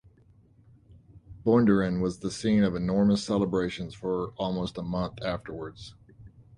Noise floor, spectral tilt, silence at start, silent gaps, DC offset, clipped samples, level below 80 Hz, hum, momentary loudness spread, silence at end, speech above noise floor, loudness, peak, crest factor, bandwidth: -59 dBFS; -7 dB/octave; 1.15 s; none; under 0.1%; under 0.1%; -52 dBFS; none; 13 LU; 0.15 s; 32 dB; -27 LUFS; -10 dBFS; 20 dB; 10.5 kHz